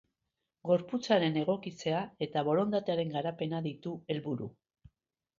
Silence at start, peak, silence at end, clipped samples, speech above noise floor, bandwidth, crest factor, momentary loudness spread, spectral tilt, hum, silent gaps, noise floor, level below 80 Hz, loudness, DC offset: 0.65 s; -14 dBFS; 0.9 s; under 0.1%; 54 dB; 7.6 kHz; 20 dB; 10 LU; -6.5 dB/octave; none; none; -86 dBFS; -72 dBFS; -33 LUFS; under 0.1%